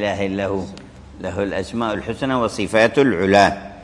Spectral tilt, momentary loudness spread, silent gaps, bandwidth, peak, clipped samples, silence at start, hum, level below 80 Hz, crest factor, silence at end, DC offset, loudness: -5.5 dB/octave; 14 LU; none; 11.5 kHz; -2 dBFS; under 0.1%; 0 s; none; -46 dBFS; 18 dB; 0 s; under 0.1%; -19 LUFS